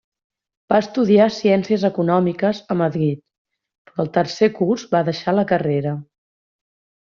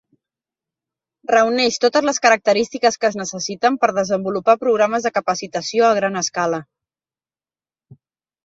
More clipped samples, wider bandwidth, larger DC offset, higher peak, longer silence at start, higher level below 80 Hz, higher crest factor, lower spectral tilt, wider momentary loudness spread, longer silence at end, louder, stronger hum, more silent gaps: neither; about the same, 7.2 kHz vs 7.8 kHz; neither; second, -4 dBFS vs 0 dBFS; second, 0.7 s vs 1.3 s; about the same, -60 dBFS vs -64 dBFS; about the same, 16 dB vs 20 dB; first, -6 dB/octave vs -3 dB/octave; about the same, 8 LU vs 7 LU; first, 1 s vs 0.5 s; about the same, -19 LUFS vs -18 LUFS; neither; first, 3.38-3.45 s, 3.78-3.85 s vs none